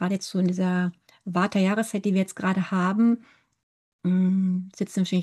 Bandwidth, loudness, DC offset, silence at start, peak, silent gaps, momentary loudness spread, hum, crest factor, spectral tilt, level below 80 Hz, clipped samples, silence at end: 12.5 kHz; -25 LUFS; under 0.1%; 0 s; -12 dBFS; 3.63-3.99 s; 8 LU; none; 12 dB; -6.5 dB/octave; -72 dBFS; under 0.1%; 0 s